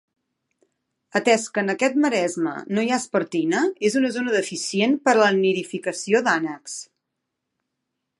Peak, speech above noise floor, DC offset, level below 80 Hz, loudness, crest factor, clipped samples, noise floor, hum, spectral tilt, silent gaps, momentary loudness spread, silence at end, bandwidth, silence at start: -4 dBFS; 59 dB; under 0.1%; -76 dBFS; -21 LUFS; 20 dB; under 0.1%; -80 dBFS; none; -4 dB/octave; none; 9 LU; 1.35 s; 11.5 kHz; 1.15 s